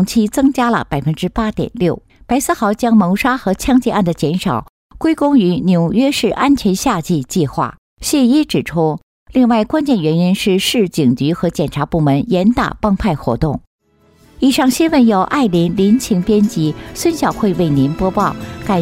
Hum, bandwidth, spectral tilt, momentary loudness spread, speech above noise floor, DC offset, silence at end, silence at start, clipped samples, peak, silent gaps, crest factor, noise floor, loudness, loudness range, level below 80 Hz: none; 16 kHz; -6 dB/octave; 7 LU; 37 dB; under 0.1%; 0 s; 0 s; under 0.1%; -2 dBFS; 4.69-4.90 s, 7.78-7.97 s, 9.03-9.26 s, 13.67-13.79 s; 12 dB; -51 dBFS; -15 LUFS; 2 LU; -36 dBFS